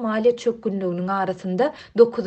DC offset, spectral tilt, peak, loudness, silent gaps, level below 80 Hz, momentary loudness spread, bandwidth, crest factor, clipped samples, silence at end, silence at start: under 0.1%; -7 dB/octave; -2 dBFS; -22 LUFS; none; -62 dBFS; 7 LU; 8.4 kHz; 18 dB; under 0.1%; 0 s; 0 s